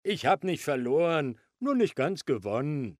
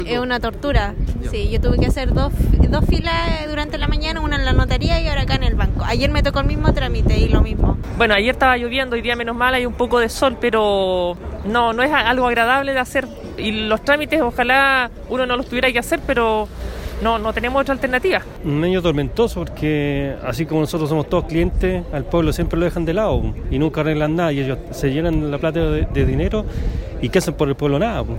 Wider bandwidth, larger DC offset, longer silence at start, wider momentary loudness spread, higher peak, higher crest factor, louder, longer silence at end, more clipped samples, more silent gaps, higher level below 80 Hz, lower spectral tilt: about the same, 15 kHz vs 16.5 kHz; neither; about the same, 0.05 s vs 0 s; about the same, 5 LU vs 7 LU; second, -12 dBFS vs -2 dBFS; about the same, 16 dB vs 16 dB; second, -29 LUFS vs -19 LUFS; about the same, 0.05 s vs 0 s; neither; neither; second, -72 dBFS vs -24 dBFS; about the same, -6 dB/octave vs -6 dB/octave